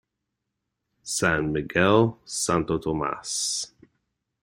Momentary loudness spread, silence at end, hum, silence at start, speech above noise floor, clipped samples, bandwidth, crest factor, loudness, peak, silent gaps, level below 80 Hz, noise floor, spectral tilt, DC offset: 10 LU; 0.75 s; none; 1.05 s; 58 dB; under 0.1%; 16 kHz; 22 dB; -24 LUFS; -4 dBFS; none; -52 dBFS; -82 dBFS; -4 dB/octave; under 0.1%